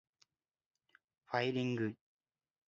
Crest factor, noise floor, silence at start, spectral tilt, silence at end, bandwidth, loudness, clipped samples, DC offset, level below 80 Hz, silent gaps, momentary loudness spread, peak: 22 dB; -77 dBFS; 1.3 s; -4.5 dB/octave; 0.75 s; 7.4 kHz; -38 LUFS; under 0.1%; under 0.1%; -82 dBFS; none; 8 LU; -20 dBFS